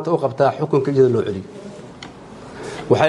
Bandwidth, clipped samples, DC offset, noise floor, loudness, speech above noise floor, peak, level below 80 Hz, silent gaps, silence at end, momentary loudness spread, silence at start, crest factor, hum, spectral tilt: 11 kHz; under 0.1%; under 0.1%; -38 dBFS; -18 LUFS; 20 dB; 0 dBFS; -54 dBFS; none; 0 s; 21 LU; 0 s; 18 dB; none; -7 dB/octave